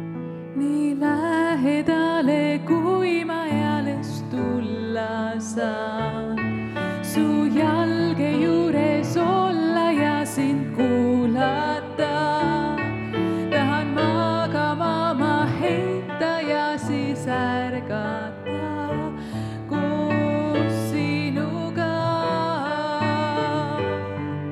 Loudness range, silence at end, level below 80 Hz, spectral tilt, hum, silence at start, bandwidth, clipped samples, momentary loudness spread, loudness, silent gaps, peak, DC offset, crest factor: 5 LU; 0 s; -58 dBFS; -6.5 dB/octave; none; 0 s; 14.5 kHz; under 0.1%; 7 LU; -23 LUFS; none; -8 dBFS; under 0.1%; 16 dB